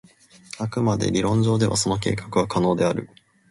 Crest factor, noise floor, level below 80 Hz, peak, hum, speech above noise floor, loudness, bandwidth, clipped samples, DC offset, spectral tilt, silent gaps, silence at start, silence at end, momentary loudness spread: 16 dB; -44 dBFS; -48 dBFS; -8 dBFS; none; 23 dB; -22 LUFS; 11.5 kHz; under 0.1%; under 0.1%; -5.5 dB/octave; none; 0.55 s; 0.45 s; 9 LU